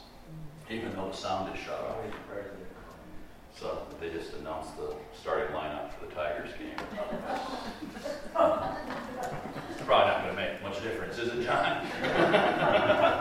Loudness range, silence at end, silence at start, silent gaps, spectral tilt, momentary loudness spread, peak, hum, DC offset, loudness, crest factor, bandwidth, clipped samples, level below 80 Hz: 11 LU; 0 s; 0 s; none; -5 dB/octave; 17 LU; -10 dBFS; none; under 0.1%; -32 LUFS; 22 dB; 16 kHz; under 0.1%; -54 dBFS